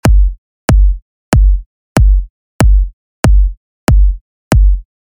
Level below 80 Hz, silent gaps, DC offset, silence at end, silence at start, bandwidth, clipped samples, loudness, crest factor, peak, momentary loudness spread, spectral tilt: -10 dBFS; 0.38-0.68 s, 1.02-1.32 s, 1.66-1.95 s, 2.30-2.59 s, 2.93-3.23 s, 3.57-3.87 s, 4.21-4.51 s; under 0.1%; 0.3 s; 0.05 s; 12.5 kHz; under 0.1%; -14 LUFS; 10 dB; 0 dBFS; 9 LU; -6.5 dB/octave